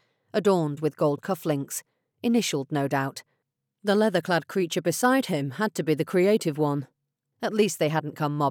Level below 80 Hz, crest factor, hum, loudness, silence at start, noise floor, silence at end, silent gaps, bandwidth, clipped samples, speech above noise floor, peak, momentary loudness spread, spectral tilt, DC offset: -90 dBFS; 16 dB; none; -26 LUFS; 0.35 s; -79 dBFS; 0 s; none; 19 kHz; under 0.1%; 54 dB; -10 dBFS; 9 LU; -5 dB/octave; under 0.1%